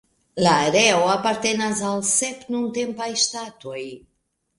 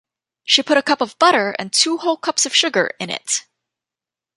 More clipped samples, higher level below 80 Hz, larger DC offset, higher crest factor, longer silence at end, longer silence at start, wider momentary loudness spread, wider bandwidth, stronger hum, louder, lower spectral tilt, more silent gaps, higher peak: neither; first, -60 dBFS vs -72 dBFS; neither; about the same, 20 dB vs 20 dB; second, 0.6 s vs 0.95 s; about the same, 0.35 s vs 0.45 s; first, 17 LU vs 8 LU; about the same, 11.5 kHz vs 11.5 kHz; neither; second, -20 LUFS vs -17 LUFS; first, -2.5 dB/octave vs -1 dB/octave; neither; about the same, -2 dBFS vs 0 dBFS